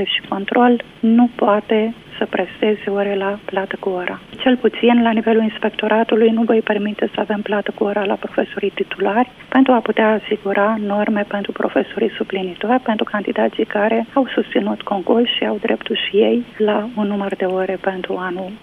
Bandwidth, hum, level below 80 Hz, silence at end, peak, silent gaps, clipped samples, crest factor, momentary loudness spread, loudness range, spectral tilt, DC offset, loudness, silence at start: 4.4 kHz; none; -56 dBFS; 0.05 s; 0 dBFS; none; under 0.1%; 16 dB; 8 LU; 3 LU; -7.5 dB/octave; under 0.1%; -18 LUFS; 0 s